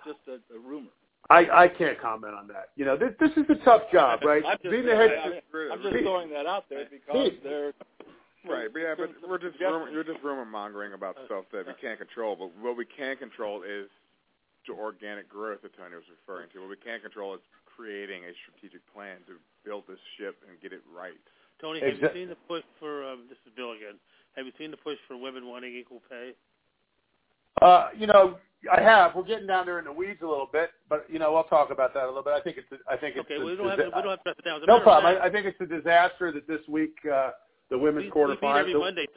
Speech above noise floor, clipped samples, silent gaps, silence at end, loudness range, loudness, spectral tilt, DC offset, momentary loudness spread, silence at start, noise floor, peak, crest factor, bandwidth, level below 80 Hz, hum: 48 dB; under 0.1%; none; 0.1 s; 20 LU; -24 LUFS; -8 dB/octave; under 0.1%; 23 LU; 0.05 s; -74 dBFS; -2 dBFS; 24 dB; 4 kHz; -64 dBFS; none